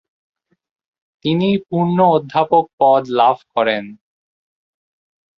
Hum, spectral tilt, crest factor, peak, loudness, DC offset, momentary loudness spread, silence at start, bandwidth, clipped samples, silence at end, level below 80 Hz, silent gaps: none; -8.5 dB/octave; 16 dB; -2 dBFS; -16 LUFS; under 0.1%; 7 LU; 1.25 s; 6.4 kHz; under 0.1%; 1.45 s; -62 dBFS; 2.73-2.78 s